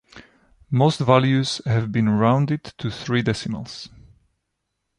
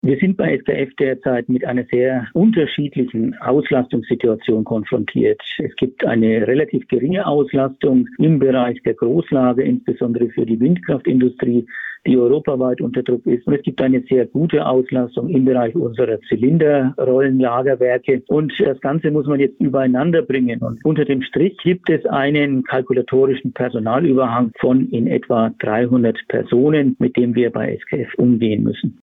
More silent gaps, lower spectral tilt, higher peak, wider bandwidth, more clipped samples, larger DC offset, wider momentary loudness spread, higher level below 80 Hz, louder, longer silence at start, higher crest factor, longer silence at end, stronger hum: neither; second, -6.5 dB/octave vs -10.5 dB/octave; first, -2 dBFS vs -6 dBFS; first, 11 kHz vs 4 kHz; neither; neither; first, 14 LU vs 5 LU; about the same, -52 dBFS vs -54 dBFS; second, -21 LUFS vs -17 LUFS; about the same, 0.15 s vs 0.05 s; first, 20 dB vs 12 dB; first, 1.1 s vs 0.1 s; neither